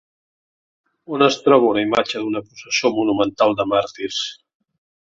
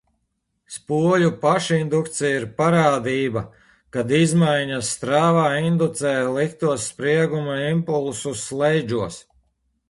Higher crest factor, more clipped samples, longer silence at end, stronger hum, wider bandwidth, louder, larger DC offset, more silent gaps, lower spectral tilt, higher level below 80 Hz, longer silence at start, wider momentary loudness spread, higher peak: about the same, 18 dB vs 18 dB; neither; about the same, 0.8 s vs 0.7 s; neither; second, 7.8 kHz vs 11.5 kHz; about the same, -19 LUFS vs -21 LUFS; neither; neither; second, -4 dB/octave vs -5.5 dB/octave; about the same, -60 dBFS vs -56 dBFS; first, 1.1 s vs 0.7 s; about the same, 11 LU vs 10 LU; about the same, -2 dBFS vs -4 dBFS